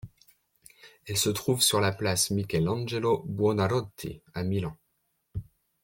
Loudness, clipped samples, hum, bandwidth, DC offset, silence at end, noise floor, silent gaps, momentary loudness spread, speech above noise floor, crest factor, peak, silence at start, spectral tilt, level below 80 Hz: -27 LUFS; under 0.1%; none; 17 kHz; under 0.1%; 0.4 s; -76 dBFS; none; 18 LU; 48 dB; 20 dB; -10 dBFS; 0.05 s; -4 dB/octave; -56 dBFS